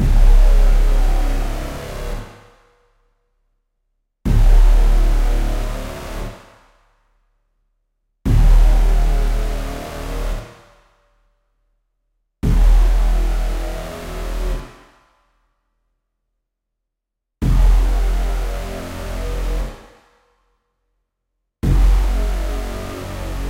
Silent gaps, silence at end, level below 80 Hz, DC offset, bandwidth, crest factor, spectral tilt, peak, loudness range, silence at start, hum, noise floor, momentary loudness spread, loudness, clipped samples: none; 0 s; -18 dBFS; under 0.1%; 12.5 kHz; 16 dB; -6.5 dB/octave; -2 dBFS; 9 LU; 0 s; none; -80 dBFS; 14 LU; -21 LUFS; under 0.1%